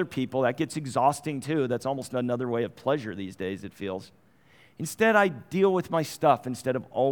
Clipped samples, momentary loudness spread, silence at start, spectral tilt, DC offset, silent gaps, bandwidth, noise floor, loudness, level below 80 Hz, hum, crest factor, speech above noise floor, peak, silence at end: under 0.1%; 12 LU; 0 s; -5.5 dB/octave; under 0.1%; none; over 20 kHz; -59 dBFS; -27 LUFS; -68 dBFS; none; 20 dB; 32 dB; -8 dBFS; 0 s